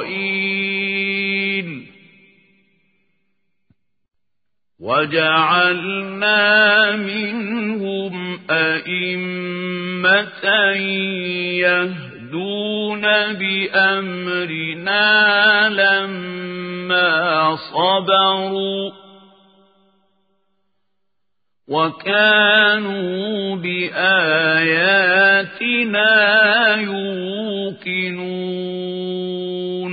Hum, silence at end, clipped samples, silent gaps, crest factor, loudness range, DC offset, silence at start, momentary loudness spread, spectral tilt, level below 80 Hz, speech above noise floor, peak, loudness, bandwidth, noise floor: none; 0 s; under 0.1%; none; 18 dB; 8 LU; under 0.1%; 0 s; 13 LU; -9.5 dB/octave; -70 dBFS; 65 dB; -2 dBFS; -16 LUFS; 5 kHz; -82 dBFS